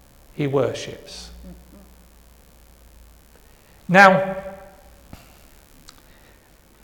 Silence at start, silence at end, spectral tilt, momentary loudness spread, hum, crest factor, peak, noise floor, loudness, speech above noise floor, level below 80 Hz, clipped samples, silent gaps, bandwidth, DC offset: 0.4 s; 2.3 s; -5.5 dB/octave; 29 LU; none; 24 dB; 0 dBFS; -52 dBFS; -17 LUFS; 35 dB; -50 dBFS; under 0.1%; none; 19 kHz; under 0.1%